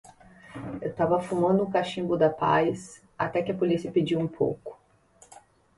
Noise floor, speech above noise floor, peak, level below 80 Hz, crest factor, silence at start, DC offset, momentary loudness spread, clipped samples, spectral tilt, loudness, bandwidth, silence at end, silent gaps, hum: -59 dBFS; 33 dB; -10 dBFS; -60 dBFS; 18 dB; 0.45 s; under 0.1%; 16 LU; under 0.1%; -7 dB/octave; -26 LUFS; 11.5 kHz; 1.05 s; none; none